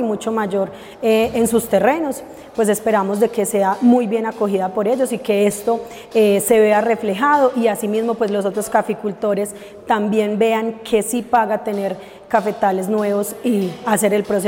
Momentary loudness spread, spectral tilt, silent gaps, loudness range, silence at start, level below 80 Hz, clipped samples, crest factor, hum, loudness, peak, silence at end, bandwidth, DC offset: 8 LU; -5 dB/octave; none; 3 LU; 0 s; -56 dBFS; under 0.1%; 16 dB; none; -18 LUFS; -2 dBFS; 0 s; 16.5 kHz; under 0.1%